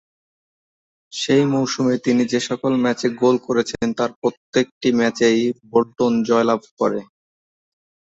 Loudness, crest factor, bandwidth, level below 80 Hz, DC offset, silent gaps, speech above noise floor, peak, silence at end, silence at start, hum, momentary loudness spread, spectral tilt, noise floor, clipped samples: -19 LUFS; 16 dB; 8 kHz; -60 dBFS; under 0.1%; 4.16-4.22 s, 4.37-4.53 s, 4.72-4.81 s, 6.71-6.77 s; over 71 dB; -4 dBFS; 1.05 s; 1.15 s; none; 5 LU; -5 dB/octave; under -90 dBFS; under 0.1%